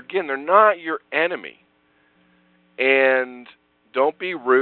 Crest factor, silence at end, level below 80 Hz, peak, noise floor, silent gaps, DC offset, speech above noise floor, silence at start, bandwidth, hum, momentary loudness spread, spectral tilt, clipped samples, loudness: 22 dB; 0 s; -76 dBFS; 0 dBFS; -62 dBFS; none; under 0.1%; 42 dB; 0.1 s; 4.4 kHz; none; 14 LU; -7.5 dB/octave; under 0.1%; -20 LUFS